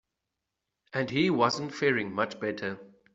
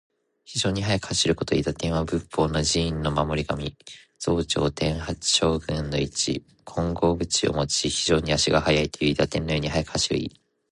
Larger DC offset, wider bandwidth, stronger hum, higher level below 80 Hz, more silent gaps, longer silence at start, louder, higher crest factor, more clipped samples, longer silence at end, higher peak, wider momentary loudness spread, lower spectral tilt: neither; second, 8 kHz vs 11.5 kHz; neither; second, -70 dBFS vs -40 dBFS; neither; first, 0.95 s vs 0.5 s; second, -29 LUFS vs -24 LUFS; about the same, 20 dB vs 20 dB; neither; second, 0.25 s vs 0.45 s; second, -10 dBFS vs -4 dBFS; first, 11 LU vs 8 LU; first, -5.5 dB/octave vs -4 dB/octave